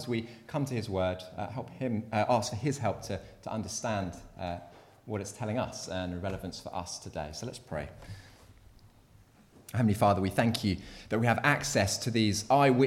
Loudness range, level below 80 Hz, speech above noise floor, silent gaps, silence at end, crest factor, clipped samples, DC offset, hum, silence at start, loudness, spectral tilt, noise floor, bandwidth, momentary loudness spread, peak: 11 LU; -56 dBFS; 29 dB; none; 0 s; 22 dB; under 0.1%; under 0.1%; none; 0 s; -32 LUFS; -5 dB/octave; -59 dBFS; 16 kHz; 13 LU; -10 dBFS